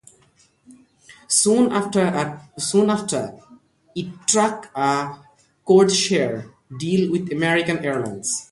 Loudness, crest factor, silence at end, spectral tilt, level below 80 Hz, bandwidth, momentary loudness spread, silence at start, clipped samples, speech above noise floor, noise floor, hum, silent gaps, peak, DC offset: -20 LUFS; 20 dB; 0.05 s; -4 dB/octave; -62 dBFS; 11.5 kHz; 16 LU; 1.1 s; under 0.1%; 38 dB; -58 dBFS; none; none; -2 dBFS; under 0.1%